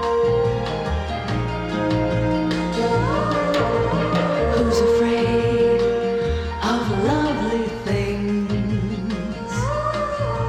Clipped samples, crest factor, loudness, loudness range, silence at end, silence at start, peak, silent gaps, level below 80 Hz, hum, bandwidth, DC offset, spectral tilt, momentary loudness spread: under 0.1%; 14 dB; -21 LUFS; 3 LU; 0 s; 0 s; -6 dBFS; none; -34 dBFS; none; 12.5 kHz; under 0.1%; -6.5 dB/octave; 7 LU